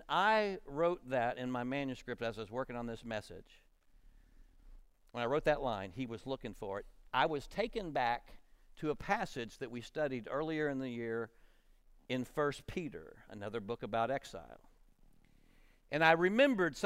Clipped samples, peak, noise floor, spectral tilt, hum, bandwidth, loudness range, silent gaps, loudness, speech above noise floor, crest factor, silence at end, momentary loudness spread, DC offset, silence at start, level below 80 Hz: under 0.1%; -14 dBFS; -65 dBFS; -5.5 dB/octave; none; 16 kHz; 7 LU; none; -36 LUFS; 28 dB; 24 dB; 0 s; 14 LU; under 0.1%; 0 s; -60 dBFS